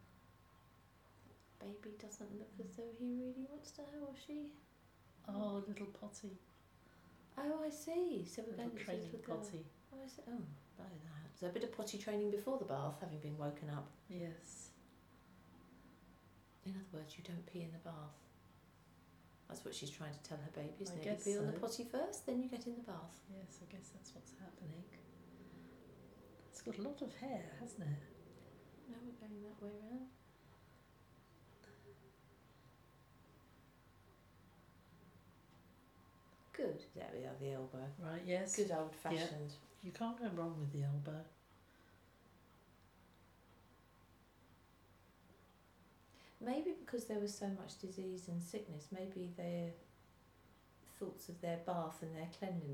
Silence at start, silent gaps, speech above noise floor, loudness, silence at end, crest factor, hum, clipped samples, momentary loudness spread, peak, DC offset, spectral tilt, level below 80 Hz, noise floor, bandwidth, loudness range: 0 s; none; 23 dB; -47 LUFS; 0 s; 22 dB; none; under 0.1%; 25 LU; -26 dBFS; under 0.1%; -5.5 dB/octave; -76 dBFS; -69 dBFS; 19 kHz; 22 LU